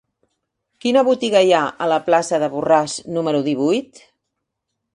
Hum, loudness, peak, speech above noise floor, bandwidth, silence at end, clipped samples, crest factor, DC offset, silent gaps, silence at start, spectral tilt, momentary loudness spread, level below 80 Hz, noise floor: none; -18 LUFS; -2 dBFS; 61 dB; 11 kHz; 1.1 s; under 0.1%; 18 dB; under 0.1%; none; 0.85 s; -4.5 dB/octave; 7 LU; -64 dBFS; -78 dBFS